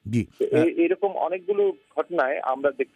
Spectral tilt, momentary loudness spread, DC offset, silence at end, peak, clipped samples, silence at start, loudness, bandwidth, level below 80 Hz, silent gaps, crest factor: -8 dB/octave; 6 LU; under 0.1%; 0.1 s; -8 dBFS; under 0.1%; 0.05 s; -24 LUFS; 11 kHz; -62 dBFS; none; 16 dB